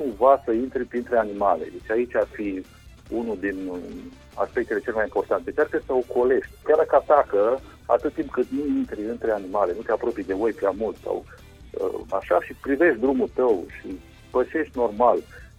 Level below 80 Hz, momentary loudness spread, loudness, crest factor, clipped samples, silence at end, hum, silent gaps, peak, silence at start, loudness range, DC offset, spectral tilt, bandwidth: -50 dBFS; 12 LU; -24 LUFS; 18 dB; under 0.1%; 0.1 s; none; none; -4 dBFS; 0 s; 6 LU; under 0.1%; -7 dB/octave; 14 kHz